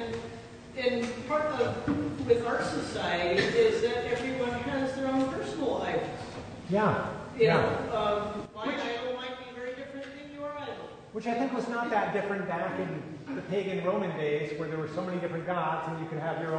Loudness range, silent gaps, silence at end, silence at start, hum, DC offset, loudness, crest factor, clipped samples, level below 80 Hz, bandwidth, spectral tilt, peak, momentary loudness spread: 6 LU; none; 0 s; 0 s; none; under 0.1%; -31 LUFS; 20 dB; under 0.1%; -58 dBFS; 9.6 kHz; -6 dB/octave; -12 dBFS; 12 LU